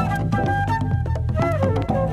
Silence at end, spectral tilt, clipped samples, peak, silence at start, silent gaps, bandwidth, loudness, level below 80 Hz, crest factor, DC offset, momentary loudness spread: 0 s; -8 dB/octave; under 0.1%; -8 dBFS; 0 s; none; 12.5 kHz; -22 LUFS; -32 dBFS; 12 dB; under 0.1%; 2 LU